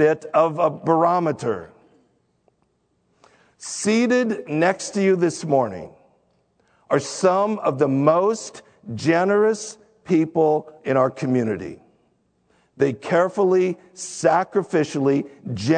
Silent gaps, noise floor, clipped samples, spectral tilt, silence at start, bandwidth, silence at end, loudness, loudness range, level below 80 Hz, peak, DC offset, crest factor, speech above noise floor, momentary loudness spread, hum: none; -67 dBFS; under 0.1%; -5.5 dB/octave; 0 s; 9.4 kHz; 0 s; -21 LUFS; 4 LU; -66 dBFS; -2 dBFS; under 0.1%; 20 dB; 47 dB; 13 LU; none